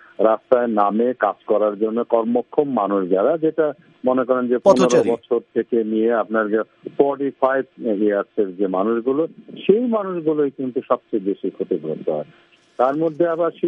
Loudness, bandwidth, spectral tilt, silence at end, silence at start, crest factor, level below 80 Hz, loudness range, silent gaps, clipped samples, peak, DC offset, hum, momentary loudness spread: -20 LUFS; 10.5 kHz; -6.5 dB/octave; 0 s; 0.2 s; 18 dB; -68 dBFS; 4 LU; none; under 0.1%; 0 dBFS; under 0.1%; none; 8 LU